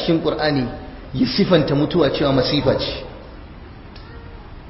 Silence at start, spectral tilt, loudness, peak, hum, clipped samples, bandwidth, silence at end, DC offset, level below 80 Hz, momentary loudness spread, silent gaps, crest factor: 0 s; -10 dB/octave; -19 LUFS; -2 dBFS; none; under 0.1%; 5.8 kHz; 0 s; under 0.1%; -38 dBFS; 23 LU; none; 18 dB